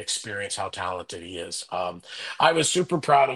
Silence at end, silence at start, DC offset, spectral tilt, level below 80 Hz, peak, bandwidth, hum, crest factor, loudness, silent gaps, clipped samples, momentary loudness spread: 0 s; 0 s; under 0.1%; -3 dB/octave; -64 dBFS; -4 dBFS; 12.5 kHz; none; 22 dB; -25 LUFS; none; under 0.1%; 15 LU